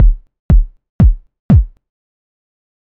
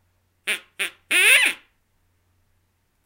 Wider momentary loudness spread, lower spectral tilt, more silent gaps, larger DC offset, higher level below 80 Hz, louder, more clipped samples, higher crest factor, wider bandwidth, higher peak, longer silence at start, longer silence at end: about the same, 15 LU vs 17 LU; first, -11.5 dB/octave vs 2.5 dB/octave; first, 0.39-0.49 s, 0.89-0.99 s, 1.39-1.49 s vs none; first, 0.3% vs under 0.1%; first, -14 dBFS vs -68 dBFS; first, -14 LUFS vs -18 LUFS; neither; second, 12 dB vs 22 dB; second, 2.9 kHz vs 16 kHz; about the same, 0 dBFS vs -2 dBFS; second, 0 s vs 0.45 s; second, 1.3 s vs 1.5 s